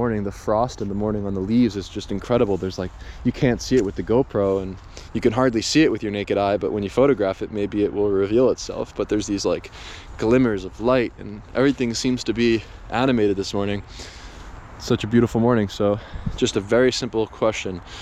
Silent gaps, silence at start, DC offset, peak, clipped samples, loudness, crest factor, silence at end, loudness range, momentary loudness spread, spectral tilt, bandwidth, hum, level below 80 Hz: none; 0 s; under 0.1%; -4 dBFS; under 0.1%; -22 LUFS; 16 dB; 0 s; 2 LU; 13 LU; -5.5 dB/octave; 13 kHz; none; -42 dBFS